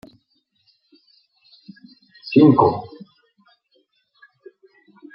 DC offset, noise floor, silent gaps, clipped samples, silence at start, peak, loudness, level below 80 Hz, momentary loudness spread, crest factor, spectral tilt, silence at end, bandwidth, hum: under 0.1%; -67 dBFS; none; under 0.1%; 2.25 s; -2 dBFS; -16 LUFS; -64 dBFS; 27 LU; 20 dB; -10.5 dB/octave; 2.3 s; 5.6 kHz; none